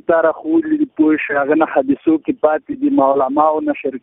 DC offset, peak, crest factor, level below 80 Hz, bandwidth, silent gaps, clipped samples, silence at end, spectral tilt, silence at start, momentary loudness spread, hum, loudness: under 0.1%; 0 dBFS; 16 dB; -58 dBFS; 3.8 kHz; none; under 0.1%; 0.05 s; -11 dB/octave; 0.1 s; 4 LU; none; -16 LUFS